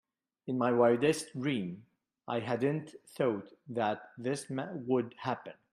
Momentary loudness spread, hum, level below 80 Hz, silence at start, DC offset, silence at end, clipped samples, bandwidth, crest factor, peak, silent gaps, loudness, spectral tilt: 14 LU; none; -76 dBFS; 0.45 s; under 0.1%; 0.2 s; under 0.1%; 15.5 kHz; 20 dB; -14 dBFS; none; -33 LUFS; -6 dB/octave